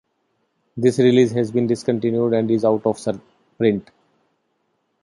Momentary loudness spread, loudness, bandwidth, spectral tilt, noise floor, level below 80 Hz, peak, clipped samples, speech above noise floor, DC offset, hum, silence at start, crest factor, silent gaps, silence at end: 12 LU; -19 LUFS; 11.5 kHz; -7 dB/octave; -70 dBFS; -60 dBFS; -2 dBFS; under 0.1%; 51 dB; under 0.1%; none; 0.75 s; 18 dB; none; 1.2 s